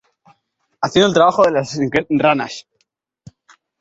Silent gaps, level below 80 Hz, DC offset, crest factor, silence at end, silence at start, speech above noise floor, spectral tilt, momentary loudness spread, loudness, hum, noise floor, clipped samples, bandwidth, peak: none; -54 dBFS; under 0.1%; 18 dB; 1.2 s; 0.8 s; 54 dB; -5 dB/octave; 12 LU; -16 LUFS; none; -69 dBFS; under 0.1%; 8 kHz; 0 dBFS